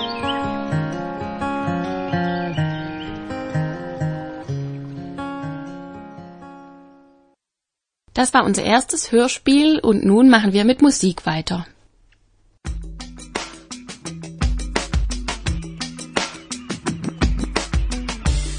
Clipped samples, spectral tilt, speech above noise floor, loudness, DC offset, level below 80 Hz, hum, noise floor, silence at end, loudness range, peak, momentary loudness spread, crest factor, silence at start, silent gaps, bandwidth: under 0.1%; -5 dB/octave; 69 dB; -20 LUFS; under 0.1%; -32 dBFS; none; -84 dBFS; 0 s; 15 LU; 0 dBFS; 18 LU; 20 dB; 0 s; none; 10.5 kHz